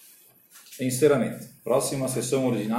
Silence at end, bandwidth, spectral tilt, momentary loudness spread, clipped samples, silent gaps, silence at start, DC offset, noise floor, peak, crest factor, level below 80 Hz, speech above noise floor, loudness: 0 s; 16.5 kHz; -5 dB/octave; 11 LU; under 0.1%; none; 0.55 s; under 0.1%; -55 dBFS; -8 dBFS; 18 dB; -64 dBFS; 30 dB; -25 LUFS